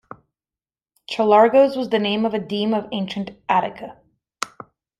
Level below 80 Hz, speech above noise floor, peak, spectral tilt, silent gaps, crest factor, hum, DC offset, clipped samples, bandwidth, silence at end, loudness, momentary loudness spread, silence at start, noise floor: -62 dBFS; over 71 dB; -2 dBFS; -5.5 dB/octave; none; 20 dB; none; under 0.1%; under 0.1%; 12 kHz; 0.55 s; -19 LUFS; 17 LU; 1.1 s; under -90 dBFS